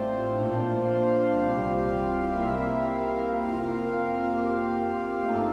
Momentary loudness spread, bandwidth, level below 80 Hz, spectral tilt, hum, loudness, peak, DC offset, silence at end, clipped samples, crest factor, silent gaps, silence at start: 4 LU; 9.8 kHz; -46 dBFS; -9 dB/octave; none; -27 LUFS; -14 dBFS; under 0.1%; 0 s; under 0.1%; 12 dB; none; 0 s